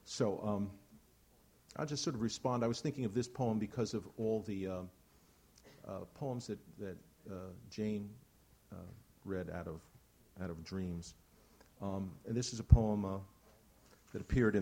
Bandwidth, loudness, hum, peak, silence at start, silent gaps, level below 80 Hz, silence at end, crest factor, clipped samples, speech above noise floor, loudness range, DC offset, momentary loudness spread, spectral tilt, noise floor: 16.5 kHz; -39 LUFS; none; -10 dBFS; 0.05 s; none; -48 dBFS; 0 s; 30 dB; under 0.1%; 30 dB; 9 LU; under 0.1%; 18 LU; -6.5 dB/octave; -68 dBFS